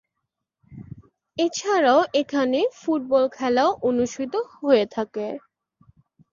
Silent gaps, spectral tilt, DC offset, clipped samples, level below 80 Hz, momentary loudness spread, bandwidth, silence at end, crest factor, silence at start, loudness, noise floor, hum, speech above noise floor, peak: none; -4 dB/octave; under 0.1%; under 0.1%; -62 dBFS; 15 LU; 7.4 kHz; 0.95 s; 18 dB; 0.7 s; -22 LUFS; -81 dBFS; none; 59 dB; -6 dBFS